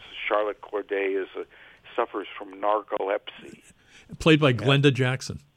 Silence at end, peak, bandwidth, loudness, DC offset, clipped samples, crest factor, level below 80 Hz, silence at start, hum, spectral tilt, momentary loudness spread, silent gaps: 0.2 s; -6 dBFS; 11.5 kHz; -25 LUFS; under 0.1%; under 0.1%; 20 dB; -56 dBFS; 0 s; none; -6 dB/octave; 17 LU; none